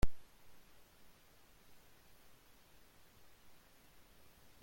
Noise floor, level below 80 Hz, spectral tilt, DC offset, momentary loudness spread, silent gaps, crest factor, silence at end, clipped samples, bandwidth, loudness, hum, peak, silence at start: -64 dBFS; -52 dBFS; -5.5 dB/octave; under 0.1%; 1 LU; none; 22 dB; 0 s; under 0.1%; 16.5 kHz; -60 LUFS; none; -18 dBFS; 0 s